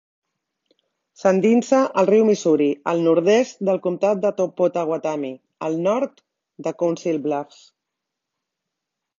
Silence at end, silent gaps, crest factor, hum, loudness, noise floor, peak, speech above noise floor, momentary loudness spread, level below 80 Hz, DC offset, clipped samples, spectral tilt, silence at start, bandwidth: 1.75 s; none; 18 dB; none; -20 LUFS; -82 dBFS; -4 dBFS; 63 dB; 12 LU; -72 dBFS; under 0.1%; under 0.1%; -6 dB/octave; 1.2 s; 7.6 kHz